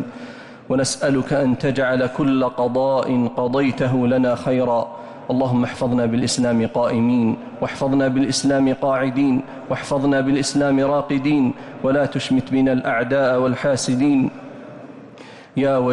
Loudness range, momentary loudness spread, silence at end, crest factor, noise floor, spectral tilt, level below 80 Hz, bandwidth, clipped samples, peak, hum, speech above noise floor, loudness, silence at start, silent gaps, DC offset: 1 LU; 9 LU; 0 s; 10 dB; -41 dBFS; -5.5 dB/octave; -52 dBFS; 11.5 kHz; under 0.1%; -10 dBFS; none; 22 dB; -19 LUFS; 0 s; none; under 0.1%